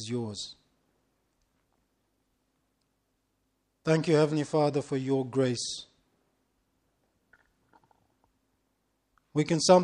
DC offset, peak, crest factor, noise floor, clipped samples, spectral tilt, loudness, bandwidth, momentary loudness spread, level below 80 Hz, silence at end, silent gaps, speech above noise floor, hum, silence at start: under 0.1%; -6 dBFS; 24 dB; -77 dBFS; under 0.1%; -5.5 dB/octave; -28 LUFS; 11 kHz; 12 LU; -70 dBFS; 0 s; none; 50 dB; none; 0 s